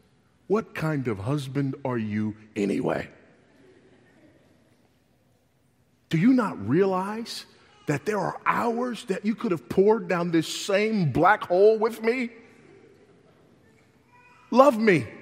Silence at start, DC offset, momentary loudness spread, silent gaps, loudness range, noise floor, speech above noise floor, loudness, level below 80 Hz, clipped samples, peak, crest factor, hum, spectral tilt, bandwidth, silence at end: 0.5 s; under 0.1%; 11 LU; none; 9 LU; -65 dBFS; 41 dB; -24 LUFS; -64 dBFS; under 0.1%; -2 dBFS; 24 dB; none; -6.5 dB/octave; 16 kHz; 0 s